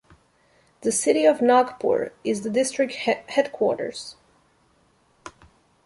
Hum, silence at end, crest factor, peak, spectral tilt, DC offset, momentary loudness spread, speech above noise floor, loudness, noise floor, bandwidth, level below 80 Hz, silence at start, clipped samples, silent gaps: none; 0.55 s; 20 dB; -6 dBFS; -3.5 dB/octave; under 0.1%; 11 LU; 40 dB; -22 LUFS; -62 dBFS; 12 kHz; -66 dBFS; 0.85 s; under 0.1%; none